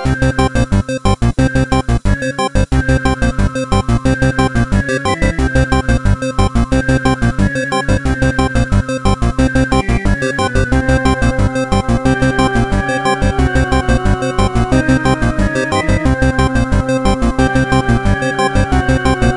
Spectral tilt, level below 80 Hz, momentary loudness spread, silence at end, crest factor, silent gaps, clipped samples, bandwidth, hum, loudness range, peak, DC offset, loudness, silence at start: -6 dB/octave; -18 dBFS; 3 LU; 0 s; 12 dB; none; under 0.1%; 11.5 kHz; none; 1 LU; 0 dBFS; 0.9%; -14 LUFS; 0 s